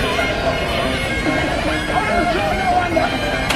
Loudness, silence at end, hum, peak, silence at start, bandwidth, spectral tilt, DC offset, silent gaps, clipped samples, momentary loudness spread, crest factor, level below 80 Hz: -18 LUFS; 0 s; none; -2 dBFS; 0 s; 15.5 kHz; -4.5 dB/octave; under 0.1%; none; under 0.1%; 2 LU; 16 dB; -30 dBFS